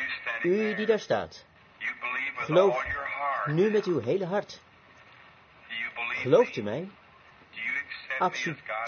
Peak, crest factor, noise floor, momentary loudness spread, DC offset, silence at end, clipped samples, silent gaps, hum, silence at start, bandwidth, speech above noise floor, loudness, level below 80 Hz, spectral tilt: -10 dBFS; 20 dB; -55 dBFS; 12 LU; under 0.1%; 0 s; under 0.1%; none; none; 0 s; 6.8 kHz; 29 dB; -28 LUFS; -64 dBFS; -6 dB/octave